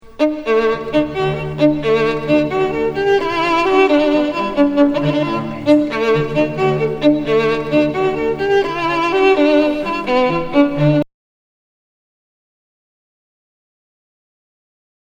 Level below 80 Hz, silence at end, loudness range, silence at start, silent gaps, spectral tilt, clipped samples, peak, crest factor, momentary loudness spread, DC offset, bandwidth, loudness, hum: -42 dBFS; 4.05 s; 4 LU; 0.05 s; none; -7 dB/octave; under 0.1%; 0 dBFS; 16 dB; 6 LU; under 0.1%; 8.2 kHz; -16 LUFS; none